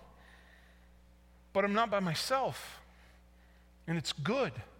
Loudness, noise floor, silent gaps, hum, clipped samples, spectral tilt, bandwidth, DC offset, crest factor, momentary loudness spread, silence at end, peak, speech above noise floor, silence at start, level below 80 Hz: -33 LUFS; -61 dBFS; none; none; under 0.1%; -4.5 dB/octave; 17.5 kHz; under 0.1%; 20 dB; 17 LU; 0.1 s; -18 dBFS; 27 dB; 0 s; -62 dBFS